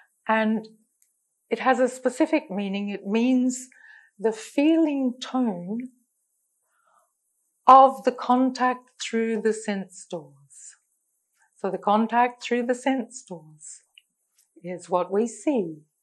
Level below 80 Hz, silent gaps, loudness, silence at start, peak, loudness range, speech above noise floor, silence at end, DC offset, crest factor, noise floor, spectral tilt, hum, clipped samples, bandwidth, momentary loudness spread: -82 dBFS; none; -23 LUFS; 0.25 s; -2 dBFS; 7 LU; 51 dB; 0.25 s; under 0.1%; 22 dB; -74 dBFS; -5 dB/octave; none; under 0.1%; 12 kHz; 17 LU